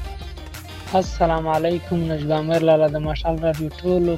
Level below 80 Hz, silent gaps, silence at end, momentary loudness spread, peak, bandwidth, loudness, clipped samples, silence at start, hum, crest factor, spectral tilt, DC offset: -34 dBFS; none; 0 s; 18 LU; -6 dBFS; 16 kHz; -21 LUFS; under 0.1%; 0 s; none; 16 dB; -7 dB/octave; under 0.1%